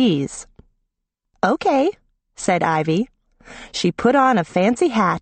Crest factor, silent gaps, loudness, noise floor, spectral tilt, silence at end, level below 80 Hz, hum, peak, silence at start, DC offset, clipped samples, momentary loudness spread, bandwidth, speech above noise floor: 16 dB; none; -19 LUFS; -78 dBFS; -5.5 dB/octave; 0 s; -54 dBFS; none; -4 dBFS; 0 s; under 0.1%; under 0.1%; 13 LU; 8.8 kHz; 59 dB